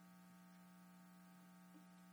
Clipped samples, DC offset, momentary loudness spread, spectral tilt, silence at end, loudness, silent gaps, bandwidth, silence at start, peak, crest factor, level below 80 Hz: under 0.1%; under 0.1%; 0 LU; -5.5 dB/octave; 0 s; -65 LUFS; none; over 20 kHz; 0 s; -52 dBFS; 12 dB; under -90 dBFS